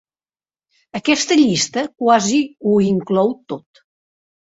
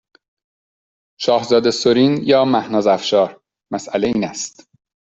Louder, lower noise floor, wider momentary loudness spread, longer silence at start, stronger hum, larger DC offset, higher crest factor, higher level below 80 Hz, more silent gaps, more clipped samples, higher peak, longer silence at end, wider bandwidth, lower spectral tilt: about the same, -16 LUFS vs -17 LUFS; about the same, under -90 dBFS vs under -90 dBFS; first, 15 LU vs 12 LU; second, 0.95 s vs 1.2 s; neither; neither; about the same, 18 dB vs 16 dB; about the same, -60 dBFS vs -58 dBFS; neither; neither; about the same, -2 dBFS vs -2 dBFS; first, 1 s vs 0.65 s; about the same, 8 kHz vs 8.2 kHz; about the same, -4 dB/octave vs -4.5 dB/octave